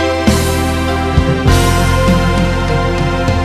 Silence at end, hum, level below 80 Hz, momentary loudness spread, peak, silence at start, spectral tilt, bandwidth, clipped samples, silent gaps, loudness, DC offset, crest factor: 0 s; none; -20 dBFS; 4 LU; 0 dBFS; 0 s; -5.5 dB/octave; 14.5 kHz; under 0.1%; none; -13 LUFS; under 0.1%; 12 dB